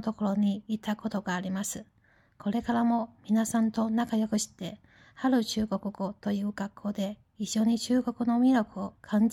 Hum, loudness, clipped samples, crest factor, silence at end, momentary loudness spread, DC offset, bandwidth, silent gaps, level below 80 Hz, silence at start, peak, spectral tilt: none; -29 LUFS; under 0.1%; 14 dB; 0 s; 10 LU; under 0.1%; 16 kHz; none; -62 dBFS; 0 s; -16 dBFS; -5 dB/octave